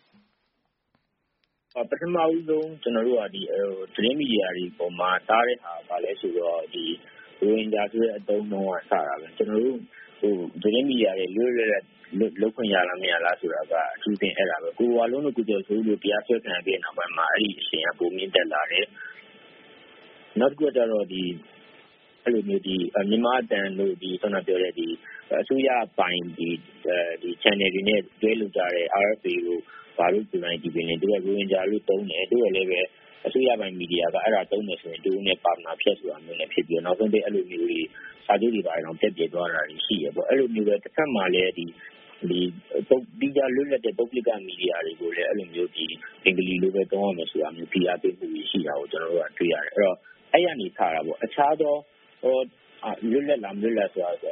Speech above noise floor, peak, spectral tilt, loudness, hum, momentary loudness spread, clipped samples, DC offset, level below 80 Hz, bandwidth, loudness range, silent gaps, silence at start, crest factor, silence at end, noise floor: 50 dB; -2 dBFS; -2.5 dB/octave; -25 LUFS; none; 8 LU; under 0.1%; under 0.1%; -70 dBFS; 4.5 kHz; 2 LU; none; 1.75 s; 24 dB; 0 s; -75 dBFS